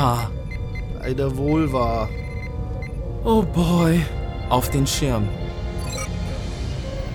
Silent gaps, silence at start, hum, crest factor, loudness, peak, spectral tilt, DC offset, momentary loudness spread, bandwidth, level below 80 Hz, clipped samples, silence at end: none; 0 s; none; 20 dB; -23 LUFS; -2 dBFS; -6 dB/octave; under 0.1%; 11 LU; 17.5 kHz; -30 dBFS; under 0.1%; 0 s